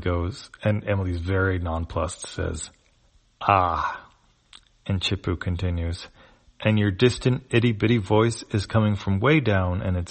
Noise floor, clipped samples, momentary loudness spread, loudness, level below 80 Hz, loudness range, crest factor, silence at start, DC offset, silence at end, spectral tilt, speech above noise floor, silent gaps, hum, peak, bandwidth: -61 dBFS; under 0.1%; 10 LU; -24 LUFS; -42 dBFS; 6 LU; 22 dB; 0 s; under 0.1%; 0 s; -6 dB/octave; 38 dB; none; none; -2 dBFS; 8.8 kHz